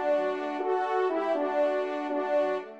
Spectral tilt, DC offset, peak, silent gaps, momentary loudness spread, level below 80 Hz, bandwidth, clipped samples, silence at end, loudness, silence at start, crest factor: -5 dB/octave; under 0.1%; -16 dBFS; none; 4 LU; -82 dBFS; 8.2 kHz; under 0.1%; 0 s; -28 LUFS; 0 s; 12 dB